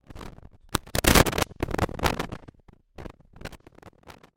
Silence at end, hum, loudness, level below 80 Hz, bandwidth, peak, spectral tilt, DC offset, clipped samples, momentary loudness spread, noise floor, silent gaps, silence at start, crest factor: 0.25 s; none; -25 LUFS; -38 dBFS; 17 kHz; -2 dBFS; -3.5 dB/octave; under 0.1%; under 0.1%; 25 LU; -52 dBFS; none; 0.1 s; 26 dB